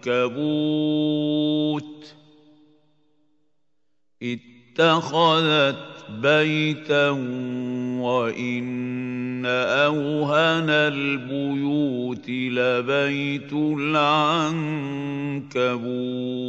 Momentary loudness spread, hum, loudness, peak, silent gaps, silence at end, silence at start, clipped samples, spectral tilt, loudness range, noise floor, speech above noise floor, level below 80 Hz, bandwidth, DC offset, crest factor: 10 LU; none; -22 LUFS; -6 dBFS; none; 0 s; 0 s; under 0.1%; -6 dB/octave; 6 LU; -78 dBFS; 56 dB; -72 dBFS; 7.8 kHz; under 0.1%; 18 dB